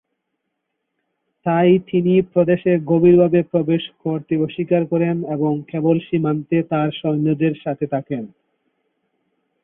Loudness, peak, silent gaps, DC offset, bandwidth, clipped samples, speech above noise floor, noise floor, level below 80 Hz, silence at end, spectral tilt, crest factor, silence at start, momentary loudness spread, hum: -18 LUFS; -2 dBFS; none; under 0.1%; 3.8 kHz; under 0.1%; 58 dB; -76 dBFS; -58 dBFS; 1.35 s; -13 dB/octave; 16 dB; 1.45 s; 10 LU; none